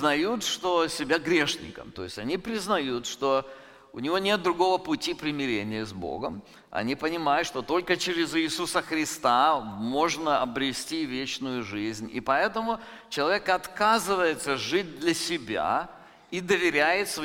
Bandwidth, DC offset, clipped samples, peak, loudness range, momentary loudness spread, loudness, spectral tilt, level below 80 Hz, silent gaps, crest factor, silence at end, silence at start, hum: 17 kHz; under 0.1%; under 0.1%; -8 dBFS; 3 LU; 11 LU; -27 LUFS; -3.5 dB/octave; -58 dBFS; none; 18 dB; 0 s; 0 s; none